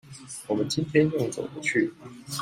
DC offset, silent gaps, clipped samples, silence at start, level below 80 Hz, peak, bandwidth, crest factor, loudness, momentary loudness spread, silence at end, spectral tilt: under 0.1%; none; under 0.1%; 0.05 s; -64 dBFS; -8 dBFS; 16 kHz; 20 dB; -27 LUFS; 16 LU; 0 s; -5 dB/octave